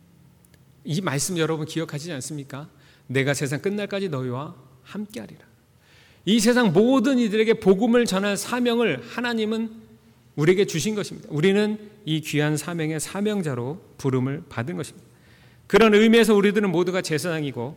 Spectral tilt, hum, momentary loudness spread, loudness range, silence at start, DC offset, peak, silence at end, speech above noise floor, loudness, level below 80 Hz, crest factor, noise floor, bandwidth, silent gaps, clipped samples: -5 dB/octave; none; 16 LU; 8 LU; 0.85 s; under 0.1%; -8 dBFS; 0 s; 33 dB; -22 LUFS; -58 dBFS; 16 dB; -55 dBFS; 18.5 kHz; none; under 0.1%